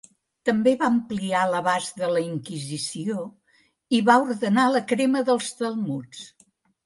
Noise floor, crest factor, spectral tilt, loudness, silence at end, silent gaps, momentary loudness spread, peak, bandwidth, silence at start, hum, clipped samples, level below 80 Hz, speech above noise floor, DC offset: -64 dBFS; 20 dB; -5 dB/octave; -23 LUFS; 0.55 s; none; 12 LU; -4 dBFS; 11.5 kHz; 0.45 s; none; under 0.1%; -68 dBFS; 41 dB; under 0.1%